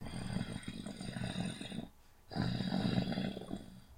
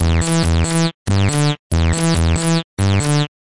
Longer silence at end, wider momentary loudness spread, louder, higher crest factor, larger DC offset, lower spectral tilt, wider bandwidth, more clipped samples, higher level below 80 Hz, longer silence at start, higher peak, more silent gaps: about the same, 0 s vs 0.1 s; first, 12 LU vs 2 LU; second, -40 LUFS vs -17 LUFS; first, 22 dB vs 12 dB; second, under 0.1% vs 2%; about the same, -6 dB/octave vs -5 dB/octave; first, 16 kHz vs 11.5 kHz; neither; second, -54 dBFS vs -30 dBFS; about the same, 0 s vs 0 s; second, -18 dBFS vs -6 dBFS; second, none vs 0.94-1.06 s, 1.59-1.70 s, 2.64-2.77 s